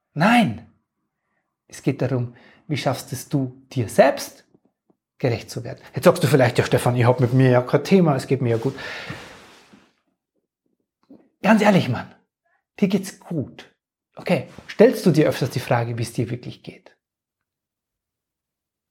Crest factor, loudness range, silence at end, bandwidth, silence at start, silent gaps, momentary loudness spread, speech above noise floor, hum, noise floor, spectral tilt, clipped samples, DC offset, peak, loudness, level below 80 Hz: 20 dB; 9 LU; 2.15 s; 17 kHz; 0.15 s; none; 16 LU; 65 dB; none; -85 dBFS; -6.5 dB/octave; under 0.1%; under 0.1%; -2 dBFS; -20 LUFS; -60 dBFS